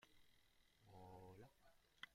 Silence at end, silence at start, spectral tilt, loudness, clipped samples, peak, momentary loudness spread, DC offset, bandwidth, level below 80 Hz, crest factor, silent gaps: 0 s; 0 s; -4.5 dB/octave; -64 LUFS; under 0.1%; -38 dBFS; 7 LU; under 0.1%; 15.5 kHz; -80 dBFS; 28 dB; none